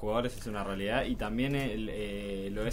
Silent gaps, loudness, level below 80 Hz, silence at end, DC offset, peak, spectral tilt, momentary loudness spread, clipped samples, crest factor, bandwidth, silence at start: none; -34 LUFS; -44 dBFS; 0 s; under 0.1%; -16 dBFS; -6 dB/octave; 6 LU; under 0.1%; 16 dB; 16 kHz; 0 s